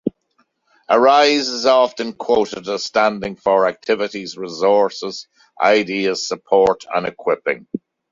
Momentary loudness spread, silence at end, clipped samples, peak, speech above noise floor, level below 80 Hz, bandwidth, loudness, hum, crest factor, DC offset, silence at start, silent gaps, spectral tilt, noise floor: 13 LU; 0.35 s; under 0.1%; -2 dBFS; 47 dB; -58 dBFS; 7.6 kHz; -17 LUFS; none; 16 dB; under 0.1%; 0.05 s; none; -3.5 dB/octave; -64 dBFS